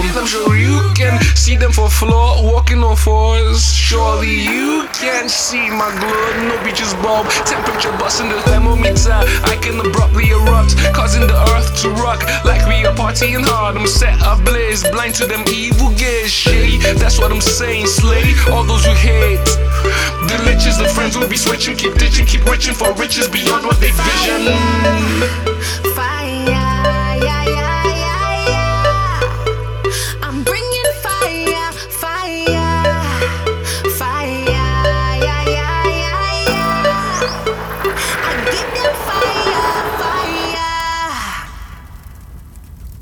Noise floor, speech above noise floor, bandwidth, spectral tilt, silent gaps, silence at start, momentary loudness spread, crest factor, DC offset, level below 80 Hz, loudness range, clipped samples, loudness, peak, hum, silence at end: -34 dBFS; 22 dB; over 20 kHz; -4 dB/octave; none; 0 s; 6 LU; 14 dB; under 0.1%; -16 dBFS; 4 LU; under 0.1%; -14 LUFS; 0 dBFS; none; 0 s